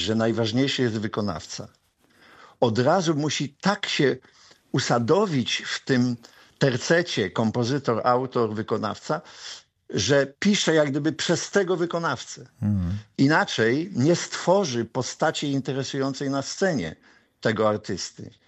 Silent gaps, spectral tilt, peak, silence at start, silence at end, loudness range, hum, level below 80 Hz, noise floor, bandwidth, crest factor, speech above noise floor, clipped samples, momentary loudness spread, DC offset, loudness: none; -5 dB/octave; -6 dBFS; 0 s; 0.2 s; 2 LU; none; -58 dBFS; -57 dBFS; 8.6 kHz; 18 dB; 33 dB; under 0.1%; 9 LU; under 0.1%; -24 LUFS